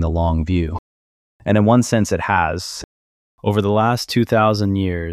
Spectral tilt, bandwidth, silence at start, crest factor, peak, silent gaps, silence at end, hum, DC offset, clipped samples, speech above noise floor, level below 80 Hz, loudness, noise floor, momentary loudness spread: -6 dB/octave; 14.5 kHz; 0 s; 16 dB; -2 dBFS; 0.79-1.40 s, 2.84-3.38 s; 0 s; none; under 0.1%; under 0.1%; over 73 dB; -34 dBFS; -18 LUFS; under -90 dBFS; 12 LU